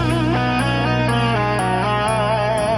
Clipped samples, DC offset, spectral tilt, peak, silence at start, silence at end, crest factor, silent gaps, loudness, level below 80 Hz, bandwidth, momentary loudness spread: under 0.1%; under 0.1%; -6 dB/octave; -6 dBFS; 0 s; 0 s; 12 dB; none; -18 LUFS; -34 dBFS; 12 kHz; 1 LU